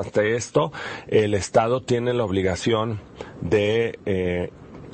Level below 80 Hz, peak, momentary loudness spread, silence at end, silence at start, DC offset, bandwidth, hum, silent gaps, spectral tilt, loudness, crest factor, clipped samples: -52 dBFS; -6 dBFS; 13 LU; 0 s; 0 s; under 0.1%; 8.8 kHz; none; none; -5.5 dB/octave; -23 LUFS; 18 dB; under 0.1%